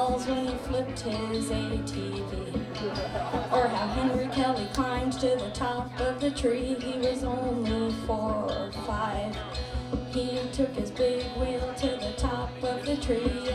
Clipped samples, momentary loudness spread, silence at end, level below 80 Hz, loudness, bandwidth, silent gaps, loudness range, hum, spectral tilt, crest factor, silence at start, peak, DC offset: under 0.1%; 6 LU; 0 s; -40 dBFS; -30 LUFS; 13 kHz; none; 3 LU; none; -5.5 dB/octave; 18 dB; 0 s; -12 dBFS; under 0.1%